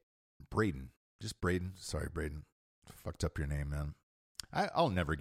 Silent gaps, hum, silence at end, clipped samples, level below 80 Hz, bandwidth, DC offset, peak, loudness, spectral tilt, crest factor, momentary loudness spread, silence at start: 0.97-1.19 s, 2.52-2.82 s, 4.03-4.35 s; none; 0 s; under 0.1%; -48 dBFS; 15.5 kHz; under 0.1%; -18 dBFS; -38 LUFS; -5.5 dB/octave; 20 dB; 16 LU; 0.4 s